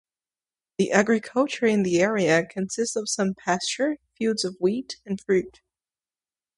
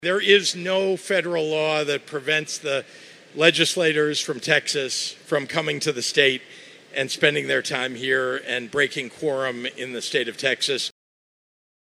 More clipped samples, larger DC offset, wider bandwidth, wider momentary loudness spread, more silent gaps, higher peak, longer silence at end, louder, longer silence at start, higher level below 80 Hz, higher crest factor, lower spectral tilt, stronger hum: neither; neither; second, 11.5 kHz vs 15 kHz; about the same, 9 LU vs 9 LU; neither; second, -4 dBFS vs 0 dBFS; about the same, 1.1 s vs 1 s; about the same, -24 LUFS vs -22 LUFS; first, 0.8 s vs 0 s; first, -64 dBFS vs -76 dBFS; about the same, 22 dB vs 24 dB; first, -4.5 dB/octave vs -2.5 dB/octave; neither